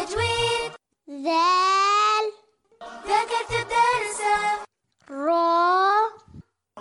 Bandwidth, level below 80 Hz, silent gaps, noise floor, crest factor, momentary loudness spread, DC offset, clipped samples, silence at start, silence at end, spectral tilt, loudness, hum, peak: 11.5 kHz; -54 dBFS; none; -55 dBFS; 14 dB; 13 LU; under 0.1%; under 0.1%; 0 s; 0 s; -3 dB/octave; -22 LUFS; none; -10 dBFS